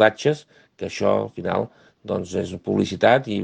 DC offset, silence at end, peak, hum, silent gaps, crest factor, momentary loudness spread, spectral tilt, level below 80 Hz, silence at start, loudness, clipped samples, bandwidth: under 0.1%; 0 s; 0 dBFS; none; none; 22 dB; 14 LU; -5.5 dB/octave; -60 dBFS; 0 s; -23 LUFS; under 0.1%; 9.4 kHz